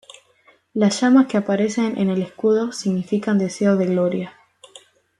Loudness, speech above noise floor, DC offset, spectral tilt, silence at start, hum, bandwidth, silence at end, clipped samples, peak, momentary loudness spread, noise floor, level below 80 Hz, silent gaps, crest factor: -20 LUFS; 38 dB; under 0.1%; -6 dB/octave; 0.75 s; none; 11.5 kHz; 0.9 s; under 0.1%; -4 dBFS; 8 LU; -57 dBFS; -66 dBFS; none; 16 dB